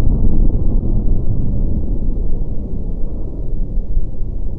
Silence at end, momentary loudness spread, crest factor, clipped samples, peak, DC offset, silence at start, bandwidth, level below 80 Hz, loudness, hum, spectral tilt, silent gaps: 0 s; 9 LU; 10 dB; under 0.1%; -2 dBFS; under 0.1%; 0 s; 1.2 kHz; -16 dBFS; -22 LUFS; none; -13.5 dB/octave; none